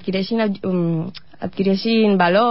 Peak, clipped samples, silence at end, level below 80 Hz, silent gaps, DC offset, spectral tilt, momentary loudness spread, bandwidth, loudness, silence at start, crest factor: -4 dBFS; under 0.1%; 0 s; -58 dBFS; none; 0.8%; -11 dB/octave; 14 LU; 5.8 kHz; -19 LUFS; 0 s; 14 dB